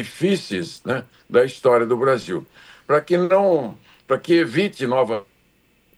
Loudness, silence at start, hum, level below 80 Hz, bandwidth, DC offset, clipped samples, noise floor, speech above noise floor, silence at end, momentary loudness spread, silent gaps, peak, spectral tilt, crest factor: -20 LUFS; 0 s; none; -64 dBFS; 12.5 kHz; under 0.1%; under 0.1%; -60 dBFS; 41 dB; 0.75 s; 10 LU; none; -4 dBFS; -6 dB/octave; 16 dB